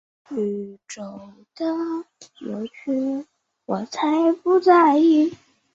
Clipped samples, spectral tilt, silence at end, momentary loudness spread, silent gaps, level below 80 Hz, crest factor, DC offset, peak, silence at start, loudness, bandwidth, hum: under 0.1%; -6 dB/octave; 0.4 s; 21 LU; none; -70 dBFS; 18 dB; under 0.1%; -4 dBFS; 0.3 s; -21 LUFS; 7.8 kHz; none